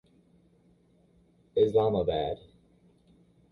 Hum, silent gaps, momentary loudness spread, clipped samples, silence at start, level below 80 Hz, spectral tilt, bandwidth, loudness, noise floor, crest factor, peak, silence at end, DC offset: none; none; 11 LU; under 0.1%; 1.55 s; -56 dBFS; -8.5 dB/octave; 4.6 kHz; -28 LUFS; -64 dBFS; 20 dB; -12 dBFS; 1.15 s; under 0.1%